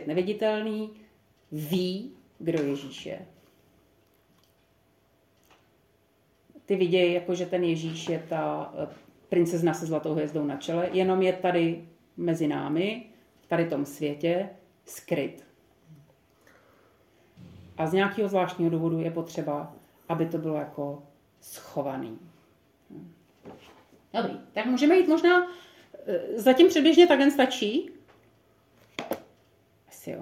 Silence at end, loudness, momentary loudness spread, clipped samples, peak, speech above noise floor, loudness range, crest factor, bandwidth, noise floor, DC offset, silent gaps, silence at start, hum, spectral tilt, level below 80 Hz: 0 s; -26 LUFS; 20 LU; under 0.1%; -6 dBFS; 40 dB; 14 LU; 22 dB; 16 kHz; -66 dBFS; under 0.1%; none; 0 s; none; -6 dB/octave; -72 dBFS